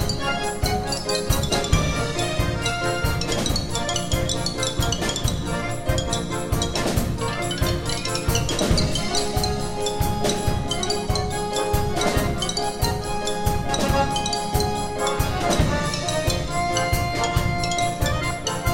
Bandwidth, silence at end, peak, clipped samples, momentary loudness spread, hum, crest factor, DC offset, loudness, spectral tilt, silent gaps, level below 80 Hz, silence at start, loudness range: 16.5 kHz; 0 s; -4 dBFS; under 0.1%; 4 LU; none; 18 dB; under 0.1%; -23 LUFS; -4 dB/octave; none; -30 dBFS; 0 s; 1 LU